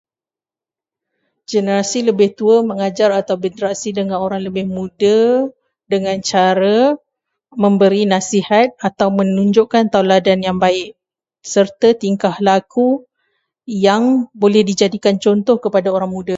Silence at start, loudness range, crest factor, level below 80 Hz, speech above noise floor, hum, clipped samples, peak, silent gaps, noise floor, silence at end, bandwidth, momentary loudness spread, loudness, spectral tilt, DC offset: 1.5 s; 3 LU; 16 dB; -56 dBFS; over 76 dB; none; under 0.1%; 0 dBFS; none; under -90 dBFS; 0 s; 8 kHz; 8 LU; -15 LUFS; -5.5 dB/octave; under 0.1%